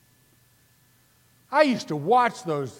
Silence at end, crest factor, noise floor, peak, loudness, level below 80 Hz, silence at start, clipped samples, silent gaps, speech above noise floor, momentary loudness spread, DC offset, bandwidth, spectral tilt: 0.1 s; 22 dB; -61 dBFS; -6 dBFS; -23 LUFS; -76 dBFS; 1.5 s; under 0.1%; none; 38 dB; 7 LU; under 0.1%; 17 kHz; -5.5 dB/octave